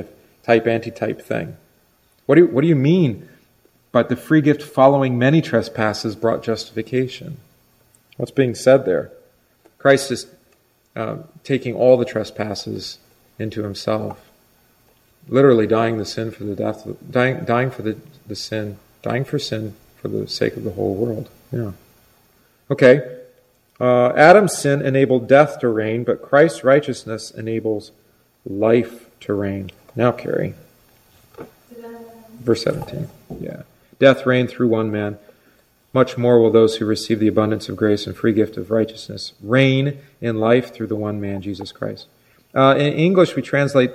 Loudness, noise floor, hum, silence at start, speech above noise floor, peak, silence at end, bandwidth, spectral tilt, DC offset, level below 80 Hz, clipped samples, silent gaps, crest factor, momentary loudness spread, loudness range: -18 LUFS; -59 dBFS; none; 0 s; 41 dB; 0 dBFS; 0 s; 15.5 kHz; -6.5 dB/octave; under 0.1%; -58 dBFS; under 0.1%; none; 18 dB; 17 LU; 9 LU